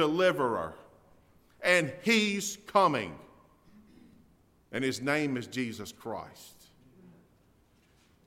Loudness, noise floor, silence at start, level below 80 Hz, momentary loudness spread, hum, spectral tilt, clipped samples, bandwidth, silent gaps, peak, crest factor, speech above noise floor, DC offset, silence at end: -30 LUFS; -65 dBFS; 0 s; -68 dBFS; 16 LU; none; -4 dB/octave; under 0.1%; 16 kHz; none; -10 dBFS; 22 dB; 35 dB; under 0.1%; 1.75 s